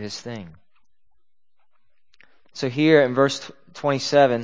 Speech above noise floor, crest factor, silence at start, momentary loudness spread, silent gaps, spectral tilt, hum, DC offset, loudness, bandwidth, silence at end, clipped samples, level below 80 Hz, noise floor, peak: 56 dB; 20 dB; 0 s; 21 LU; none; -5 dB/octave; none; 0.3%; -20 LUFS; 8 kHz; 0 s; under 0.1%; -66 dBFS; -76 dBFS; -2 dBFS